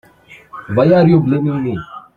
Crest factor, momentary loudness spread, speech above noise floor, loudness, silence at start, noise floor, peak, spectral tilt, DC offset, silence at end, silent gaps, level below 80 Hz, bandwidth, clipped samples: 14 dB; 20 LU; 31 dB; -14 LUFS; 0.3 s; -44 dBFS; -2 dBFS; -10 dB/octave; under 0.1%; 0.15 s; none; -48 dBFS; 4.9 kHz; under 0.1%